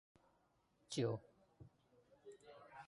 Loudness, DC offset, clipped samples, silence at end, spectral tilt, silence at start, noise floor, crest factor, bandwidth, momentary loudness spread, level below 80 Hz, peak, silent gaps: -44 LUFS; under 0.1%; under 0.1%; 0 s; -5.5 dB/octave; 0.9 s; -79 dBFS; 22 dB; 11 kHz; 24 LU; -80 dBFS; -28 dBFS; none